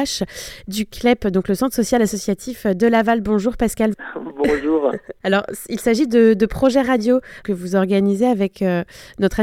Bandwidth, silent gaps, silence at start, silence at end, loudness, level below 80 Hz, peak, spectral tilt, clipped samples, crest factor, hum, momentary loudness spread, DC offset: 16.5 kHz; none; 0 s; 0 s; -19 LUFS; -42 dBFS; -2 dBFS; -5.5 dB/octave; under 0.1%; 16 dB; none; 10 LU; under 0.1%